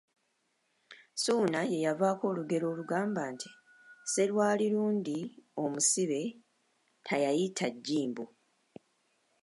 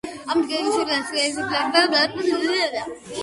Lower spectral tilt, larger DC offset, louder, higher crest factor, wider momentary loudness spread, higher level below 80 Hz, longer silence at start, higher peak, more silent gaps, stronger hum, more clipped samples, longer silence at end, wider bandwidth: first, -4 dB/octave vs -2 dB/octave; neither; second, -32 LUFS vs -21 LUFS; about the same, 18 dB vs 20 dB; first, 14 LU vs 7 LU; second, -84 dBFS vs -60 dBFS; first, 0.9 s vs 0.05 s; second, -16 dBFS vs -2 dBFS; neither; neither; neither; first, 1.15 s vs 0 s; about the same, 11.5 kHz vs 11.5 kHz